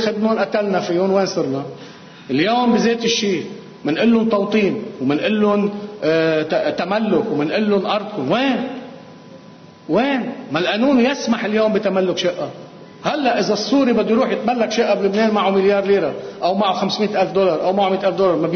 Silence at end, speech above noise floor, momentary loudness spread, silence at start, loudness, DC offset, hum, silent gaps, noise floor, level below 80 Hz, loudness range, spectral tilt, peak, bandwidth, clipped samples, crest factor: 0 s; 24 dB; 8 LU; 0 s; -18 LUFS; under 0.1%; none; none; -42 dBFS; -58 dBFS; 3 LU; -5.5 dB/octave; -6 dBFS; 6.6 kHz; under 0.1%; 12 dB